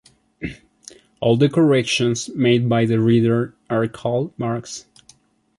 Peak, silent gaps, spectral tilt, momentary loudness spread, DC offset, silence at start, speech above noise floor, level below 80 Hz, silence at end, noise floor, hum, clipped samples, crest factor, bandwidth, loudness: -4 dBFS; none; -6 dB/octave; 17 LU; under 0.1%; 0.4 s; 36 dB; -54 dBFS; 0.8 s; -54 dBFS; none; under 0.1%; 16 dB; 11.5 kHz; -19 LUFS